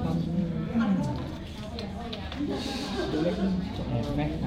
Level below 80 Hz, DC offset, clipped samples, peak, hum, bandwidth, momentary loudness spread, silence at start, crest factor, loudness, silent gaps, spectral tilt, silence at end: -42 dBFS; under 0.1%; under 0.1%; -14 dBFS; none; 12.5 kHz; 9 LU; 0 s; 14 dB; -30 LUFS; none; -7 dB/octave; 0 s